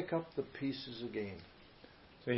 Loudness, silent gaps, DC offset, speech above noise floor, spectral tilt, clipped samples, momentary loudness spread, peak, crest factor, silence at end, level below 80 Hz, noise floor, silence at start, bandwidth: -42 LUFS; none; under 0.1%; 19 dB; -5 dB/octave; under 0.1%; 20 LU; -20 dBFS; 22 dB; 0 s; -70 dBFS; -60 dBFS; 0 s; 5.8 kHz